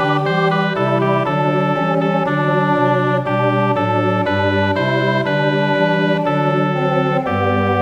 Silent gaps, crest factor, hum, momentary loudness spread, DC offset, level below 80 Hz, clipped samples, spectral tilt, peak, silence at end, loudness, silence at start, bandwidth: none; 14 dB; none; 1 LU; under 0.1%; -58 dBFS; under 0.1%; -8 dB/octave; -2 dBFS; 0 s; -16 LUFS; 0 s; 8.8 kHz